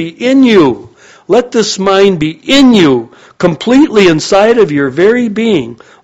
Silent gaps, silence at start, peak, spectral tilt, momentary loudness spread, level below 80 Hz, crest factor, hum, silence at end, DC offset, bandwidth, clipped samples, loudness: none; 0 s; 0 dBFS; -5 dB/octave; 8 LU; -42 dBFS; 8 dB; none; 0.3 s; under 0.1%; 8.4 kHz; 0.9%; -8 LUFS